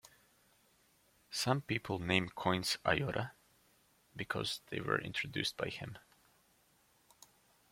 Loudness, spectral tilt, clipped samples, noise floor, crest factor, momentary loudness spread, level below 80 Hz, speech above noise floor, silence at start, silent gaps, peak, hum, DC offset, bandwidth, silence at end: -37 LUFS; -4 dB/octave; under 0.1%; -71 dBFS; 28 dB; 13 LU; -66 dBFS; 34 dB; 1.3 s; none; -12 dBFS; none; under 0.1%; 16.5 kHz; 1.75 s